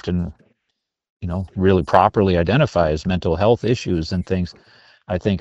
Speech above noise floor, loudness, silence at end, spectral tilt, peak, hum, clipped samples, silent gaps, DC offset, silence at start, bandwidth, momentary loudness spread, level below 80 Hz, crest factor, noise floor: 58 dB; -19 LUFS; 0 s; -7.5 dB/octave; 0 dBFS; none; under 0.1%; 1.10-1.17 s; under 0.1%; 0.05 s; 8 kHz; 12 LU; -38 dBFS; 20 dB; -77 dBFS